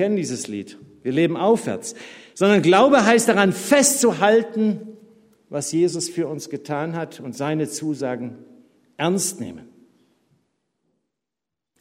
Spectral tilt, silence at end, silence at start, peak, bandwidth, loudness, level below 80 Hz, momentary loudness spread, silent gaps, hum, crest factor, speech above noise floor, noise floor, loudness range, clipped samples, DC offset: -4 dB/octave; 2.15 s; 0 s; 0 dBFS; 16 kHz; -20 LUFS; -68 dBFS; 17 LU; none; none; 20 dB; 66 dB; -86 dBFS; 12 LU; under 0.1%; under 0.1%